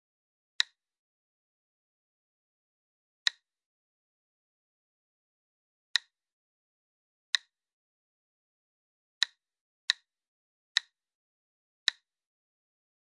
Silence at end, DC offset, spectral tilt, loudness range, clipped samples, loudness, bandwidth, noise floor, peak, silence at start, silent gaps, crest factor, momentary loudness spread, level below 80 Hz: 3.15 s; under 0.1%; 8 dB/octave; 5 LU; under 0.1%; -32 LUFS; 11 kHz; under -90 dBFS; -8 dBFS; 7.35 s; 7.73-9.21 s, 9.61-9.88 s; 34 dB; 0 LU; under -90 dBFS